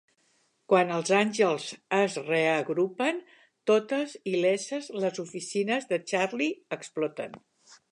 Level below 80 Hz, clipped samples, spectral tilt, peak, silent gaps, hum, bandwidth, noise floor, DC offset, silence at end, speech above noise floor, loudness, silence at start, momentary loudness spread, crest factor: -82 dBFS; under 0.1%; -4.5 dB/octave; -8 dBFS; none; none; 11 kHz; -70 dBFS; under 0.1%; 0.15 s; 42 dB; -28 LUFS; 0.7 s; 10 LU; 20 dB